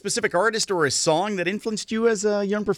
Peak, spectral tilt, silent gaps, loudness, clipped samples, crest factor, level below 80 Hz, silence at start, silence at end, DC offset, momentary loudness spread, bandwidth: -8 dBFS; -3 dB/octave; none; -22 LUFS; under 0.1%; 16 dB; -60 dBFS; 0.05 s; 0 s; under 0.1%; 5 LU; 18.5 kHz